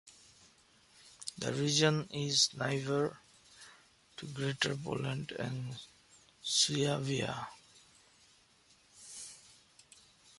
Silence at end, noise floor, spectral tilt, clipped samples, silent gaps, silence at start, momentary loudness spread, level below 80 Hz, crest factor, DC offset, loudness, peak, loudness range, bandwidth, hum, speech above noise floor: 1 s; -66 dBFS; -3.5 dB/octave; under 0.1%; none; 0.05 s; 25 LU; -70 dBFS; 24 dB; under 0.1%; -33 LUFS; -14 dBFS; 7 LU; 11.5 kHz; none; 32 dB